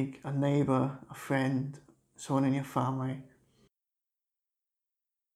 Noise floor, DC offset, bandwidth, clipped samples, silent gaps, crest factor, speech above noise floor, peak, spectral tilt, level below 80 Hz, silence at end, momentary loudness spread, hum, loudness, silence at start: under -90 dBFS; under 0.1%; 14 kHz; under 0.1%; none; 18 dB; over 59 dB; -16 dBFS; -7.5 dB/octave; -70 dBFS; 2.1 s; 14 LU; none; -32 LUFS; 0 s